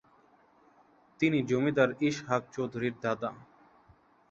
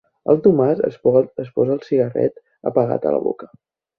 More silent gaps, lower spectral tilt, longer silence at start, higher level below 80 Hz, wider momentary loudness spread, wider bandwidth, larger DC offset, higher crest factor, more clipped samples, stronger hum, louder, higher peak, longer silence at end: neither; second, -6.5 dB/octave vs -11 dB/octave; first, 1.2 s vs 0.25 s; second, -68 dBFS vs -60 dBFS; about the same, 8 LU vs 9 LU; first, 7.6 kHz vs 5 kHz; neither; first, 22 dB vs 16 dB; neither; neither; second, -30 LUFS vs -19 LUFS; second, -10 dBFS vs -2 dBFS; first, 0.9 s vs 0.55 s